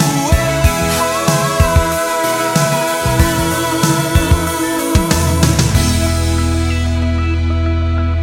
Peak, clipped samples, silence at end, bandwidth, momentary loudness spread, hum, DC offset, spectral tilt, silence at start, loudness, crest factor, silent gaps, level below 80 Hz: 0 dBFS; under 0.1%; 0 s; 17 kHz; 4 LU; none; under 0.1%; -5 dB/octave; 0 s; -14 LUFS; 14 dB; none; -20 dBFS